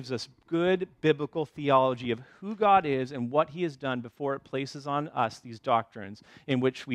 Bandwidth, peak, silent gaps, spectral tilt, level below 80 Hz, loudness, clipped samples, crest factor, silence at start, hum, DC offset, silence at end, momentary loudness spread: 11 kHz; -10 dBFS; none; -6.5 dB/octave; -68 dBFS; -29 LUFS; under 0.1%; 20 dB; 0 s; none; under 0.1%; 0 s; 12 LU